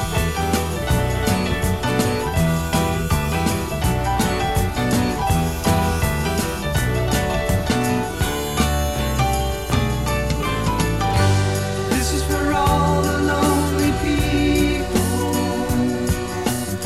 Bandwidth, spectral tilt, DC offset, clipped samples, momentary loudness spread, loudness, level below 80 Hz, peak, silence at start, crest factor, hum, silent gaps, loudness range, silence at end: 16 kHz; -5 dB/octave; 0.7%; under 0.1%; 4 LU; -20 LUFS; -28 dBFS; -4 dBFS; 0 s; 16 dB; none; none; 2 LU; 0 s